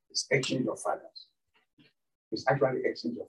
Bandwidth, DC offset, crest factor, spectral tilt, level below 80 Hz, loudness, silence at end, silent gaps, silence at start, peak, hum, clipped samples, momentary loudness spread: 12 kHz; under 0.1%; 22 dB; -4 dB/octave; -80 dBFS; -30 LUFS; 0 s; 1.73-1.77 s, 2.15-2.31 s; 0.15 s; -10 dBFS; none; under 0.1%; 13 LU